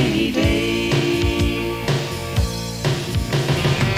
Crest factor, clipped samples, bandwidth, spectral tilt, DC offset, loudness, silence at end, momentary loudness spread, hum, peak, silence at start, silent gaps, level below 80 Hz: 14 dB; under 0.1%; 16.5 kHz; -5.5 dB/octave; 0.2%; -20 LUFS; 0 s; 4 LU; none; -6 dBFS; 0 s; none; -30 dBFS